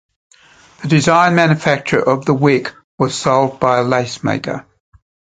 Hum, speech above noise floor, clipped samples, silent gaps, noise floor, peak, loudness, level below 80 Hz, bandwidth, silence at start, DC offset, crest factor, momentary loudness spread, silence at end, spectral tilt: none; 32 dB; under 0.1%; 2.84-2.98 s; -46 dBFS; 0 dBFS; -15 LUFS; -52 dBFS; 9.4 kHz; 0.8 s; under 0.1%; 16 dB; 11 LU; 0.8 s; -5.5 dB/octave